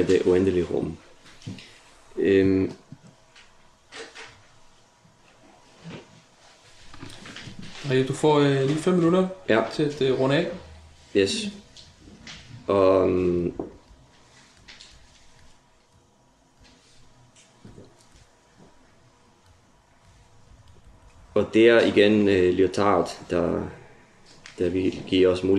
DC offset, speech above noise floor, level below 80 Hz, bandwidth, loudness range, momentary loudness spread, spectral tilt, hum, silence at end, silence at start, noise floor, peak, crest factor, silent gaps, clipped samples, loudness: under 0.1%; 39 dB; -58 dBFS; 11.5 kHz; 18 LU; 24 LU; -6 dB/octave; none; 0 s; 0 s; -60 dBFS; -6 dBFS; 20 dB; none; under 0.1%; -22 LUFS